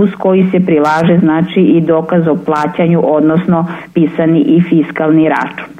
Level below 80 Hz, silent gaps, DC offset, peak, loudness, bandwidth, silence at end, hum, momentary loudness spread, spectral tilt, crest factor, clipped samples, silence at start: -52 dBFS; none; under 0.1%; 0 dBFS; -11 LUFS; 7.4 kHz; 0.05 s; none; 4 LU; -9 dB/octave; 10 dB; under 0.1%; 0 s